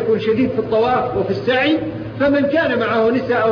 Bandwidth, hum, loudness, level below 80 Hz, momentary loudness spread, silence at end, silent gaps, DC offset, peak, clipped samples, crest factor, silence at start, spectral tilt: 6.6 kHz; none; -17 LUFS; -48 dBFS; 4 LU; 0 s; none; under 0.1%; -4 dBFS; under 0.1%; 12 dB; 0 s; -7.5 dB/octave